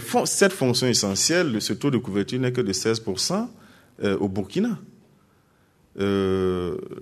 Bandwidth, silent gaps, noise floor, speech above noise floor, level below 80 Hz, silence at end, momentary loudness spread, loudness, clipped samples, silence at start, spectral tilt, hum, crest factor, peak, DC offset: 13.5 kHz; none; -61 dBFS; 37 dB; -60 dBFS; 0 s; 9 LU; -23 LUFS; under 0.1%; 0 s; -4 dB/octave; none; 20 dB; -4 dBFS; under 0.1%